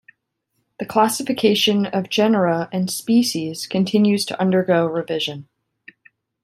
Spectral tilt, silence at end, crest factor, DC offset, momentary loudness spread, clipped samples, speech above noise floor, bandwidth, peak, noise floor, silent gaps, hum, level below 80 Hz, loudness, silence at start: -5 dB/octave; 1 s; 18 dB; under 0.1%; 7 LU; under 0.1%; 54 dB; 15.5 kHz; -2 dBFS; -73 dBFS; none; none; -64 dBFS; -19 LUFS; 0.8 s